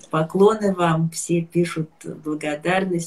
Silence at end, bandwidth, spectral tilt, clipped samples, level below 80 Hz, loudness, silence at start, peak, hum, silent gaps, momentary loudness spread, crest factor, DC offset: 0 s; 12.5 kHz; -6 dB/octave; under 0.1%; -60 dBFS; -21 LUFS; 0.15 s; -4 dBFS; none; none; 12 LU; 18 dB; 0.1%